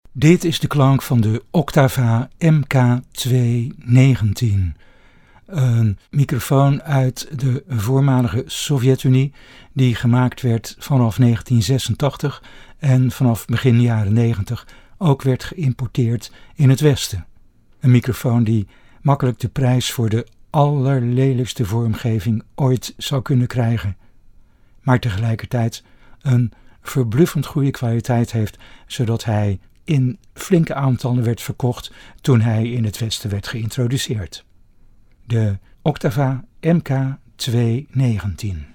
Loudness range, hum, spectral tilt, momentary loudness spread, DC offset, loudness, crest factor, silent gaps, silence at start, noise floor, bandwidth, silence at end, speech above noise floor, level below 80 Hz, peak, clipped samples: 4 LU; none; -6.5 dB/octave; 9 LU; under 0.1%; -18 LUFS; 18 dB; none; 0.1 s; -48 dBFS; 17.5 kHz; 0.1 s; 31 dB; -42 dBFS; 0 dBFS; under 0.1%